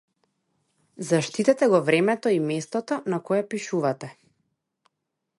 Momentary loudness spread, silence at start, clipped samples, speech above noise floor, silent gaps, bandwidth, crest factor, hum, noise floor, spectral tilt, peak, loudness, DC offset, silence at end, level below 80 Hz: 9 LU; 1 s; under 0.1%; 58 dB; none; 11.5 kHz; 20 dB; none; -81 dBFS; -5.5 dB/octave; -6 dBFS; -24 LUFS; under 0.1%; 1.25 s; -76 dBFS